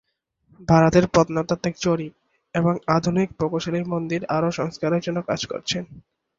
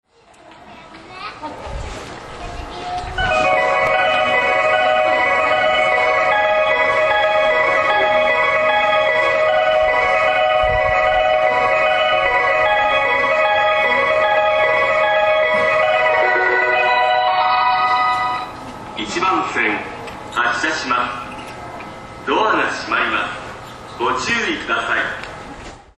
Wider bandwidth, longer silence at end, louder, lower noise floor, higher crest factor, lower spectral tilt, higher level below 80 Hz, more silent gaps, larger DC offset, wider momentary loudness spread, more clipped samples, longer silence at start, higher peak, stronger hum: second, 7.6 kHz vs 10.5 kHz; first, 0.4 s vs 0.2 s; second, -22 LUFS vs -15 LUFS; first, -63 dBFS vs -46 dBFS; about the same, 20 dB vs 16 dB; first, -6 dB/octave vs -3.5 dB/octave; second, -50 dBFS vs -42 dBFS; neither; neither; second, 10 LU vs 16 LU; neither; about the same, 0.6 s vs 0.6 s; about the same, -2 dBFS vs -2 dBFS; neither